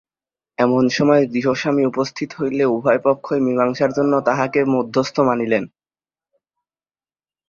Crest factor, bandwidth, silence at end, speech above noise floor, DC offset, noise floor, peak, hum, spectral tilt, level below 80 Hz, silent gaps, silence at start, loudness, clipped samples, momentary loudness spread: 16 dB; 7.2 kHz; 1.8 s; over 73 dB; under 0.1%; under -90 dBFS; -2 dBFS; none; -6 dB/octave; -62 dBFS; none; 0.6 s; -18 LUFS; under 0.1%; 7 LU